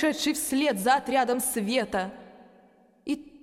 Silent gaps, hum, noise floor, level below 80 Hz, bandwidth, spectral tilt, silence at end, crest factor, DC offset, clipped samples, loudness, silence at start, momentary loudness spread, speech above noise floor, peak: none; none; -59 dBFS; -62 dBFS; 16 kHz; -3 dB/octave; 0.05 s; 18 dB; under 0.1%; under 0.1%; -26 LUFS; 0 s; 11 LU; 33 dB; -10 dBFS